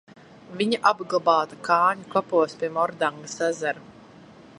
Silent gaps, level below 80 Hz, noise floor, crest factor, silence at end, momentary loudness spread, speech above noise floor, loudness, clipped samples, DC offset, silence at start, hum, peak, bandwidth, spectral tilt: none; -72 dBFS; -48 dBFS; 20 dB; 0.65 s; 8 LU; 24 dB; -24 LUFS; under 0.1%; under 0.1%; 0.5 s; none; -4 dBFS; 11.5 kHz; -4 dB/octave